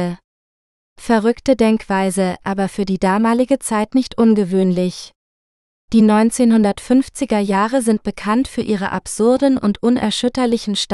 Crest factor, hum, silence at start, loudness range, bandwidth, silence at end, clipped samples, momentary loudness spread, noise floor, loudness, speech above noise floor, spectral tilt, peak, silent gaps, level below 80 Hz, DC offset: 16 dB; none; 0 s; 2 LU; 12.5 kHz; 0 s; under 0.1%; 7 LU; under -90 dBFS; -16 LUFS; over 74 dB; -5.5 dB/octave; -2 dBFS; 0.24-0.96 s, 5.15-5.88 s; -46 dBFS; under 0.1%